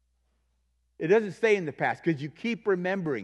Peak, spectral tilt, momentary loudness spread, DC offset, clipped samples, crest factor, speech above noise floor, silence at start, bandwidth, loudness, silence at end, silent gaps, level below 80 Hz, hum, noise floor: -10 dBFS; -6.5 dB/octave; 7 LU; under 0.1%; under 0.1%; 18 dB; 46 dB; 1 s; 10 kHz; -27 LUFS; 0 s; none; -72 dBFS; none; -72 dBFS